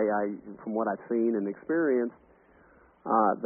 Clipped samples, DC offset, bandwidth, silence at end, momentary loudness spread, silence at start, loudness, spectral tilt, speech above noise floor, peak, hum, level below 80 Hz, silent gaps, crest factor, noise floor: under 0.1%; under 0.1%; 2.6 kHz; 0 s; 10 LU; 0 s; -29 LUFS; -2 dB/octave; 31 dB; -12 dBFS; none; -72 dBFS; none; 18 dB; -59 dBFS